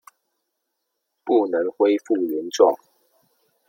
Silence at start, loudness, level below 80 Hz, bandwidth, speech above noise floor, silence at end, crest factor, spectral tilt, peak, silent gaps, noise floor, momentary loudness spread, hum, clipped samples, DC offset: 1.25 s; -21 LUFS; -78 dBFS; 16.5 kHz; 58 dB; 0.95 s; 20 dB; -4 dB/octave; -2 dBFS; none; -78 dBFS; 9 LU; none; under 0.1%; under 0.1%